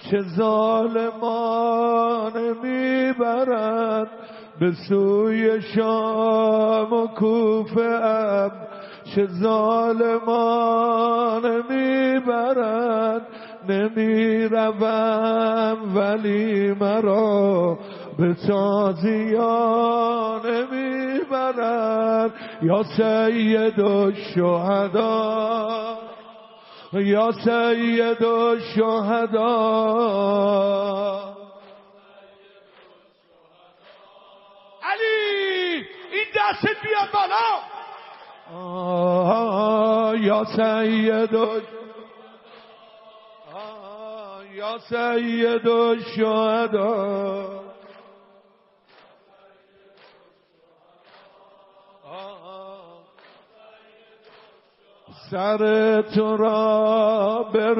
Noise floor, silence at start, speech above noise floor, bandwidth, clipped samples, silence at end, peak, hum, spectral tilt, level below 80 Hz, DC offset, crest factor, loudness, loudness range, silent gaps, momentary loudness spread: -59 dBFS; 0 s; 39 dB; 5.8 kHz; under 0.1%; 0 s; -6 dBFS; none; -4.5 dB/octave; -72 dBFS; under 0.1%; 16 dB; -21 LUFS; 7 LU; none; 13 LU